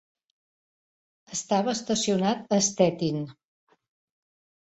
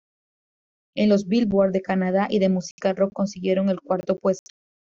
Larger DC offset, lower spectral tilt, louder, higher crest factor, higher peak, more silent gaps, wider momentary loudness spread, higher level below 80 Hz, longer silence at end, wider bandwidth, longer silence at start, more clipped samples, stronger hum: neither; second, -4 dB/octave vs -7 dB/octave; second, -26 LUFS vs -23 LUFS; first, 22 dB vs 14 dB; about the same, -8 dBFS vs -8 dBFS; second, none vs 2.71-2.78 s; first, 11 LU vs 6 LU; second, -66 dBFS vs -60 dBFS; first, 1.35 s vs 0.55 s; first, 8.2 kHz vs 7.4 kHz; first, 1.3 s vs 0.95 s; neither; neither